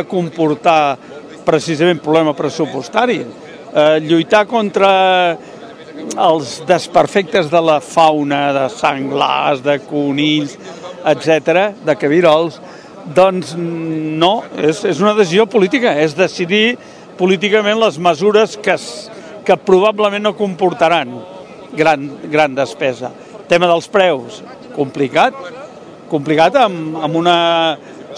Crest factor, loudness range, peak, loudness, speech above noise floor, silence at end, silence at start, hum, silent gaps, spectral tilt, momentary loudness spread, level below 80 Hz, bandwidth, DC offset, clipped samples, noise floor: 14 dB; 2 LU; 0 dBFS; -14 LUFS; 20 dB; 0 s; 0 s; none; none; -5 dB/octave; 15 LU; -58 dBFS; 11 kHz; under 0.1%; 0.2%; -34 dBFS